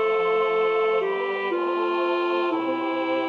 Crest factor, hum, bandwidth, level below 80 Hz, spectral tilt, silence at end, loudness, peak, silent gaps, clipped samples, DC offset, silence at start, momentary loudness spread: 12 dB; none; 6.4 kHz; -76 dBFS; -6 dB/octave; 0 s; -24 LUFS; -12 dBFS; none; under 0.1%; under 0.1%; 0 s; 4 LU